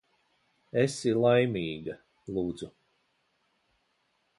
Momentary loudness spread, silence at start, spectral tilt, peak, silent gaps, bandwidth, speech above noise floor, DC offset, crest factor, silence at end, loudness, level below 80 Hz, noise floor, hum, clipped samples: 18 LU; 0.75 s; -6 dB/octave; -12 dBFS; none; 11.5 kHz; 46 dB; under 0.1%; 20 dB; 1.7 s; -29 LUFS; -64 dBFS; -74 dBFS; none; under 0.1%